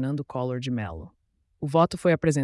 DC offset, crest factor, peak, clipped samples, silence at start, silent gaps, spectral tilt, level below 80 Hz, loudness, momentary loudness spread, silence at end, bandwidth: under 0.1%; 16 dB; -10 dBFS; under 0.1%; 0 s; none; -6.5 dB/octave; -54 dBFS; -26 LUFS; 14 LU; 0 s; 12 kHz